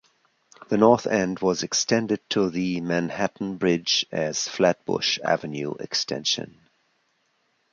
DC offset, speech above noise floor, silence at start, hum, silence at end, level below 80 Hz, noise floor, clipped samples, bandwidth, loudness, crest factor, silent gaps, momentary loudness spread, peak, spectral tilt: under 0.1%; 46 dB; 0.7 s; none; 1.25 s; -62 dBFS; -70 dBFS; under 0.1%; 7.6 kHz; -24 LUFS; 22 dB; none; 7 LU; -2 dBFS; -3.5 dB/octave